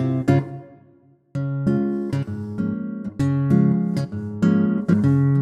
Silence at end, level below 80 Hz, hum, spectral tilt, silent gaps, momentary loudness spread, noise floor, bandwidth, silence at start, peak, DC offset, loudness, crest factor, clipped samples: 0 s; -52 dBFS; none; -9.5 dB/octave; none; 11 LU; -55 dBFS; 8.8 kHz; 0 s; -4 dBFS; under 0.1%; -21 LUFS; 16 dB; under 0.1%